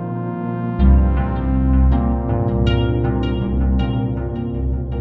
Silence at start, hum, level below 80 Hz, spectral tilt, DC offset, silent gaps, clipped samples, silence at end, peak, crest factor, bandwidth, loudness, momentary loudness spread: 0 s; none; -20 dBFS; -10 dB/octave; under 0.1%; none; under 0.1%; 0 s; -2 dBFS; 16 dB; 4.5 kHz; -19 LUFS; 8 LU